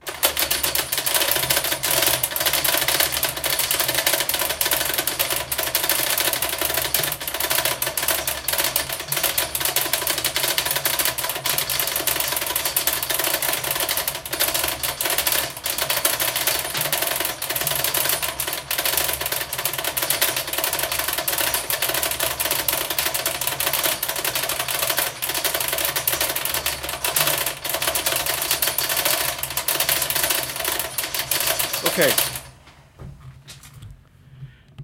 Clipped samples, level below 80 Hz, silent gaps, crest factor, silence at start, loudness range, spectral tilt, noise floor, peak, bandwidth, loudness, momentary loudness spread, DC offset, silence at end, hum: under 0.1%; -48 dBFS; none; 22 dB; 0.05 s; 2 LU; -0.5 dB/octave; -48 dBFS; 0 dBFS; 17.5 kHz; -20 LUFS; 4 LU; under 0.1%; 0 s; none